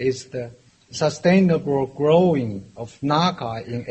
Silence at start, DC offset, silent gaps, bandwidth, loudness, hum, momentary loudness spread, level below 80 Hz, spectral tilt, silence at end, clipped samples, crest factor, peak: 0 s; under 0.1%; none; 8.4 kHz; -20 LUFS; none; 16 LU; -56 dBFS; -6.5 dB/octave; 0 s; under 0.1%; 18 dB; -2 dBFS